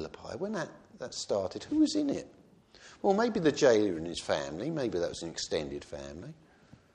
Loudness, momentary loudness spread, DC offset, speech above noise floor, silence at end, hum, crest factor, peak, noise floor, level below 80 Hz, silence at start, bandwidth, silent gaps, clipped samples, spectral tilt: -31 LUFS; 17 LU; under 0.1%; 28 dB; 0.6 s; none; 20 dB; -12 dBFS; -59 dBFS; -62 dBFS; 0 s; 10.5 kHz; none; under 0.1%; -4.5 dB/octave